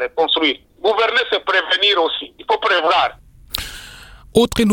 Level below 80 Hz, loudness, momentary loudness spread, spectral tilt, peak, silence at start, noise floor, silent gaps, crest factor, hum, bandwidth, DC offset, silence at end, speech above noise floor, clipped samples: -42 dBFS; -17 LUFS; 12 LU; -3.5 dB/octave; 0 dBFS; 0 s; -40 dBFS; none; 18 dB; none; 19 kHz; under 0.1%; 0 s; 23 dB; under 0.1%